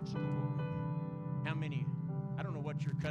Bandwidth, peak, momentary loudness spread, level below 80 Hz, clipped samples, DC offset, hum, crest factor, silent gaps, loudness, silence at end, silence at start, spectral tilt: 7.4 kHz; -22 dBFS; 3 LU; -66 dBFS; under 0.1%; under 0.1%; none; 14 dB; none; -39 LUFS; 0 s; 0 s; -8.5 dB/octave